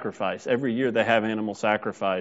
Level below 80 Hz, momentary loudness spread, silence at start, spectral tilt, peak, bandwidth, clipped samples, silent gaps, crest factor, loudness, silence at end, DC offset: -70 dBFS; 6 LU; 0 s; -3.5 dB/octave; -6 dBFS; 8 kHz; under 0.1%; none; 20 dB; -25 LUFS; 0 s; under 0.1%